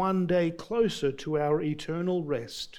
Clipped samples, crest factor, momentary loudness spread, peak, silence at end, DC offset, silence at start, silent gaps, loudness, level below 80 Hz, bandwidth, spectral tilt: under 0.1%; 14 dB; 6 LU; -14 dBFS; 0 s; under 0.1%; 0 s; none; -29 LUFS; -56 dBFS; 16 kHz; -6.5 dB/octave